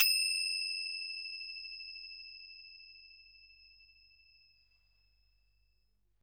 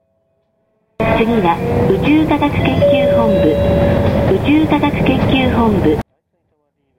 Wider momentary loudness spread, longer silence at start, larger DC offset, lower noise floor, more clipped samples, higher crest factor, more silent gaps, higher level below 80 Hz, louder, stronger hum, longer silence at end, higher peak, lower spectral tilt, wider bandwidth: first, 26 LU vs 3 LU; second, 0 s vs 1 s; second, under 0.1% vs 0.5%; first, -77 dBFS vs -64 dBFS; neither; first, 28 dB vs 12 dB; neither; second, -76 dBFS vs -30 dBFS; second, -35 LUFS vs -13 LUFS; neither; first, 2.35 s vs 0.95 s; second, -12 dBFS vs 0 dBFS; second, 6 dB/octave vs -8 dB/octave; first, 19.5 kHz vs 16.5 kHz